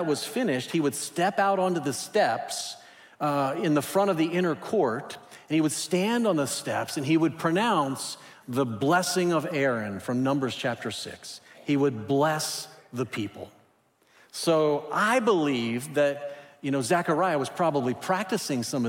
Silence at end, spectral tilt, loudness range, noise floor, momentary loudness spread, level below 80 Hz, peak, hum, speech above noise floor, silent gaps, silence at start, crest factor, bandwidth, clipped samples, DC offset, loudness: 0 s; -4.5 dB/octave; 3 LU; -64 dBFS; 11 LU; -74 dBFS; -10 dBFS; none; 38 dB; none; 0 s; 16 dB; 16.5 kHz; under 0.1%; under 0.1%; -26 LUFS